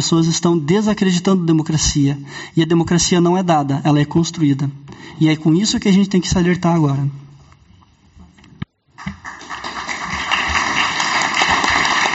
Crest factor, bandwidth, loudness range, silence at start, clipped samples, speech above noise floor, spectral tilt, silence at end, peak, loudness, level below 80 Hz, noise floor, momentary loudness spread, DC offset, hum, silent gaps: 16 dB; 8.2 kHz; 8 LU; 0 s; under 0.1%; 34 dB; -4.5 dB/octave; 0 s; -2 dBFS; -16 LUFS; -40 dBFS; -49 dBFS; 16 LU; under 0.1%; none; none